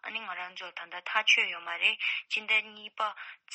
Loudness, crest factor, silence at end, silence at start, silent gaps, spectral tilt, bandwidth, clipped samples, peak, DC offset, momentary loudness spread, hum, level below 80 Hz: -28 LUFS; 22 dB; 0 s; 0.05 s; none; 1 dB/octave; 8.4 kHz; under 0.1%; -10 dBFS; under 0.1%; 16 LU; none; under -90 dBFS